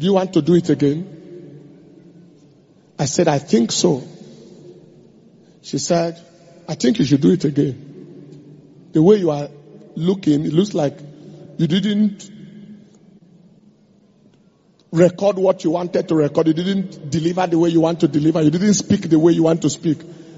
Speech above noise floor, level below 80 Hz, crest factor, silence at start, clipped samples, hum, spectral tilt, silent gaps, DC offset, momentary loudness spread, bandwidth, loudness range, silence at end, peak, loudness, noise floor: 38 dB; -58 dBFS; 18 dB; 0 s; under 0.1%; none; -6.5 dB/octave; none; under 0.1%; 20 LU; 8 kHz; 7 LU; 0 s; -2 dBFS; -17 LUFS; -55 dBFS